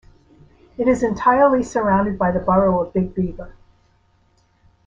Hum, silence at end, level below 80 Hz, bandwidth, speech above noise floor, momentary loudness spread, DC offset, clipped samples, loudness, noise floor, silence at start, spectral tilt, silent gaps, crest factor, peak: none; 1.35 s; -42 dBFS; 7.6 kHz; 42 dB; 11 LU; under 0.1%; under 0.1%; -18 LUFS; -59 dBFS; 0.8 s; -8 dB/octave; none; 16 dB; -4 dBFS